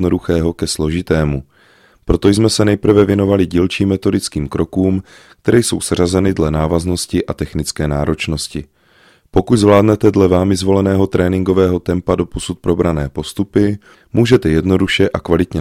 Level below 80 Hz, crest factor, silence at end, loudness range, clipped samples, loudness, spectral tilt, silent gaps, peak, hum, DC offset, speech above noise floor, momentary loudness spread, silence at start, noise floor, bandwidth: -32 dBFS; 14 dB; 0 s; 3 LU; under 0.1%; -15 LUFS; -6 dB/octave; none; 0 dBFS; none; under 0.1%; 36 dB; 9 LU; 0 s; -50 dBFS; 15.5 kHz